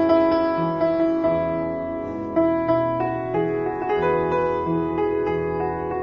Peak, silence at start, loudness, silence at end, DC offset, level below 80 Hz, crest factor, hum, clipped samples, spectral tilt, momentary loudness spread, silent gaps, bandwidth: -6 dBFS; 0 s; -22 LUFS; 0 s; under 0.1%; -48 dBFS; 16 dB; none; under 0.1%; -9 dB/octave; 5 LU; none; 5.6 kHz